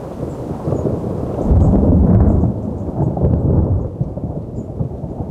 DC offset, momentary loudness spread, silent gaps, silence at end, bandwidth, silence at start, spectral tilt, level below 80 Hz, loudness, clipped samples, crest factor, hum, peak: under 0.1%; 13 LU; none; 0 s; 7.2 kHz; 0 s; -11.5 dB/octave; -22 dBFS; -17 LUFS; under 0.1%; 14 dB; none; -2 dBFS